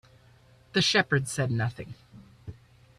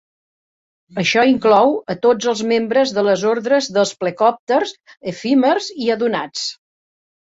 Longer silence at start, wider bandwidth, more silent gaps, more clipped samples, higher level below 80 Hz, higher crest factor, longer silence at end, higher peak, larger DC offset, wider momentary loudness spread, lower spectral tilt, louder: second, 0.75 s vs 0.95 s; first, 14 kHz vs 8 kHz; second, none vs 4.39-4.47 s; neither; about the same, -60 dBFS vs -62 dBFS; about the same, 20 dB vs 16 dB; second, 0.45 s vs 0.75 s; second, -10 dBFS vs -2 dBFS; neither; first, 25 LU vs 11 LU; about the same, -4 dB/octave vs -4.5 dB/octave; second, -26 LUFS vs -17 LUFS